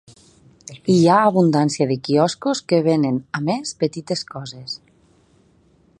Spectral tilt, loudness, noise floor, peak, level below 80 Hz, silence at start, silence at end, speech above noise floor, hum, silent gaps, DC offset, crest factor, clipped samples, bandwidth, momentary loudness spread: -6 dB/octave; -19 LUFS; -56 dBFS; -2 dBFS; -62 dBFS; 0.7 s; 1.25 s; 38 dB; none; none; under 0.1%; 18 dB; under 0.1%; 11.5 kHz; 17 LU